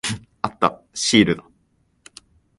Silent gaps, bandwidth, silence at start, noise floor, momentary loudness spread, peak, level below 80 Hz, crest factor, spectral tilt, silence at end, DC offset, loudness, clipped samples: none; 11.5 kHz; 0.05 s; -64 dBFS; 12 LU; -2 dBFS; -52 dBFS; 22 dB; -3.5 dB/octave; 1.2 s; under 0.1%; -20 LUFS; under 0.1%